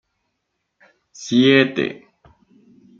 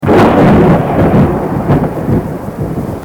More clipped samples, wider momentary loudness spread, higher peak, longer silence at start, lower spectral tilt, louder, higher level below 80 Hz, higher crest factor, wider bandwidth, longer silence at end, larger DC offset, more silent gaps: neither; about the same, 14 LU vs 12 LU; about the same, -2 dBFS vs 0 dBFS; first, 1.2 s vs 0 s; second, -5 dB/octave vs -8.5 dB/octave; second, -17 LUFS vs -10 LUFS; second, -64 dBFS vs -26 dBFS; first, 20 dB vs 10 dB; second, 7.6 kHz vs 19.5 kHz; first, 1.05 s vs 0 s; neither; neither